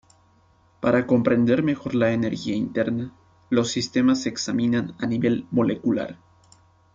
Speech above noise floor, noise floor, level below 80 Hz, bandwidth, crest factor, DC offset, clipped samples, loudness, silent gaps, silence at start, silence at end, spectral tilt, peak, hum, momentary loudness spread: 37 dB; -59 dBFS; -58 dBFS; 7.6 kHz; 18 dB; under 0.1%; under 0.1%; -23 LUFS; none; 0.8 s; 0.8 s; -6 dB/octave; -4 dBFS; none; 7 LU